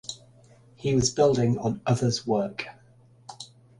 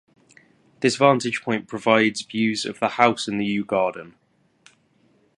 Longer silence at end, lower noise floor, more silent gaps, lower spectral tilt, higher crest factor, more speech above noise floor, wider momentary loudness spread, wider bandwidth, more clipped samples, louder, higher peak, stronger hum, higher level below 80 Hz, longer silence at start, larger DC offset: second, 0.35 s vs 1.3 s; second, -56 dBFS vs -61 dBFS; neither; about the same, -5.5 dB/octave vs -4.5 dB/octave; about the same, 18 dB vs 22 dB; second, 32 dB vs 40 dB; first, 21 LU vs 7 LU; about the same, 11.5 kHz vs 11.5 kHz; neither; second, -25 LUFS vs -21 LUFS; second, -8 dBFS vs 0 dBFS; neither; first, -54 dBFS vs -66 dBFS; second, 0.1 s vs 0.8 s; neither